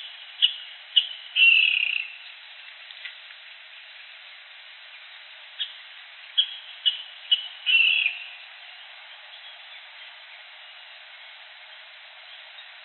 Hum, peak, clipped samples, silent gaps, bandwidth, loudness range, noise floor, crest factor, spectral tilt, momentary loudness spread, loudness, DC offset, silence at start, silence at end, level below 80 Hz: none; -4 dBFS; under 0.1%; none; 4.4 kHz; 20 LU; -46 dBFS; 24 dB; 6 dB/octave; 25 LU; -21 LUFS; under 0.1%; 0 s; 0.05 s; under -90 dBFS